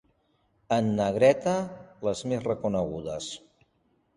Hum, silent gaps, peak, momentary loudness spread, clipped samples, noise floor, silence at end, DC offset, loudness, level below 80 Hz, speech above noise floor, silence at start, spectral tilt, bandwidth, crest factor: none; none; -6 dBFS; 14 LU; under 0.1%; -70 dBFS; 0.8 s; under 0.1%; -27 LUFS; -58 dBFS; 44 dB; 0.7 s; -6 dB/octave; 11.5 kHz; 22 dB